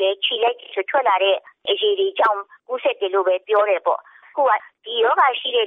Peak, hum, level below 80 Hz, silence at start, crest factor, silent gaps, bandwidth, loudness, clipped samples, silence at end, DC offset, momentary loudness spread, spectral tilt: -6 dBFS; none; -84 dBFS; 0 s; 14 dB; none; 4.3 kHz; -20 LUFS; under 0.1%; 0 s; under 0.1%; 9 LU; -3 dB/octave